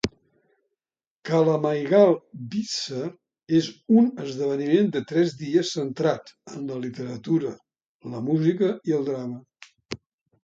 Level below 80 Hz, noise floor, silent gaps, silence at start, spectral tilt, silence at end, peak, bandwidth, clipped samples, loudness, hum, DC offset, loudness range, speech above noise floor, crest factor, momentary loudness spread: -60 dBFS; under -90 dBFS; 1.07-1.22 s, 7.86-8.00 s; 0.05 s; -6.5 dB/octave; 0.45 s; -6 dBFS; 7.8 kHz; under 0.1%; -24 LUFS; none; under 0.1%; 5 LU; over 67 dB; 20 dB; 17 LU